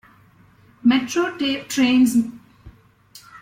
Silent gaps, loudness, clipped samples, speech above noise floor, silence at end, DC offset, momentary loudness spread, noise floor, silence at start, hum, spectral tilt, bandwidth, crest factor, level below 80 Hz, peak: none; -19 LUFS; under 0.1%; 34 dB; 0.05 s; under 0.1%; 7 LU; -53 dBFS; 0.85 s; none; -3.5 dB/octave; 16.5 kHz; 16 dB; -56 dBFS; -6 dBFS